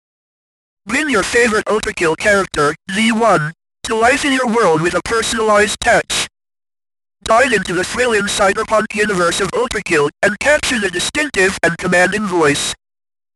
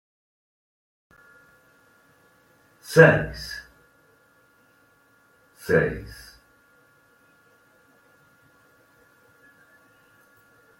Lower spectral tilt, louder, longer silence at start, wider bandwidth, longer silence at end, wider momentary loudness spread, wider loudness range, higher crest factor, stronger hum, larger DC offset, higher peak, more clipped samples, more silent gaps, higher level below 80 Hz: second, -3 dB/octave vs -6 dB/octave; first, -14 LUFS vs -20 LUFS; second, 0.85 s vs 2.9 s; second, 12.5 kHz vs 16.5 kHz; second, 0.6 s vs 4.75 s; second, 6 LU vs 28 LU; second, 1 LU vs 7 LU; second, 14 dB vs 26 dB; neither; neither; about the same, -2 dBFS vs -2 dBFS; neither; neither; first, -42 dBFS vs -52 dBFS